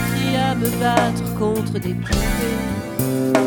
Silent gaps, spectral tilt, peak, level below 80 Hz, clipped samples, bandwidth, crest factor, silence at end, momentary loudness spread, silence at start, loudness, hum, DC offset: none; -5.5 dB/octave; 0 dBFS; -32 dBFS; under 0.1%; 19.5 kHz; 20 dB; 0 s; 6 LU; 0 s; -20 LUFS; none; under 0.1%